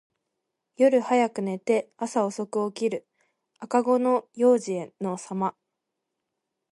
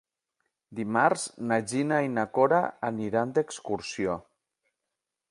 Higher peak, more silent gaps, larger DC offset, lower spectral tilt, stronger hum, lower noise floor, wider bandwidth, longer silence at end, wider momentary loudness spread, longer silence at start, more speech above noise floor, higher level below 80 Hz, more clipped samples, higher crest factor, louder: about the same, -8 dBFS vs -6 dBFS; neither; neither; about the same, -6 dB/octave vs -5 dB/octave; neither; about the same, -83 dBFS vs -86 dBFS; about the same, 11.5 kHz vs 11.5 kHz; about the same, 1.2 s vs 1.1 s; about the same, 10 LU vs 10 LU; about the same, 0.8 s vs 0.7 s; about the same, 58 dB vs 59 dB; second, -78 dBFS vs -66 dBFS; neither; about the same, 18 dB vs 22 dB; first, -25 LUFS vs -28 LUFS